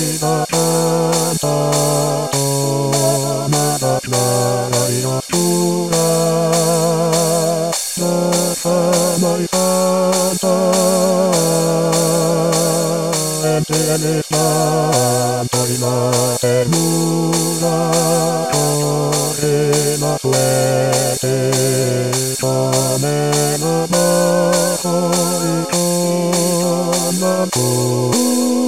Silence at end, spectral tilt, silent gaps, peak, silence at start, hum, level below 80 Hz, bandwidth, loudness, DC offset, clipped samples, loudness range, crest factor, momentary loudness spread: 0 s; -4.5 dB/octave; none; -2 dBFS; 0 s; none; -54 dBFS; 16.5 kHz; -15 LUFS; 0.6%; under 0.1%; 1 LU; 14 dB; 3 LU